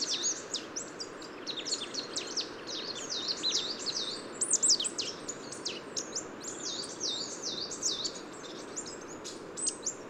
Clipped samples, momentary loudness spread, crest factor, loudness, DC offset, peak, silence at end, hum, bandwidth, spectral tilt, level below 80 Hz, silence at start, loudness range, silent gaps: under 0.1%; 13 LU; 20 dB; -33 LUFS; under 0.1%; -16 dBFS; 0 s; none; 16 kHz; 0 dB/octave; -72 dBFS; 0 s; 5 LU; none